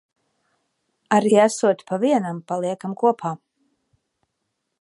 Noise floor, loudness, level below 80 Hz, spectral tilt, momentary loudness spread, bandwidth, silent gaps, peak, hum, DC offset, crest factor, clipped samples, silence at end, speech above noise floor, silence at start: -77 dBFS; -21 LUFS; -74 dBFS; -5.5 dB/octave; 11 LU; 11.5 kHz; none; -2 dBFS; none; under 0.1%; 20 dB; under 0.1%; 1.45 s; 57 dB; 1.1 s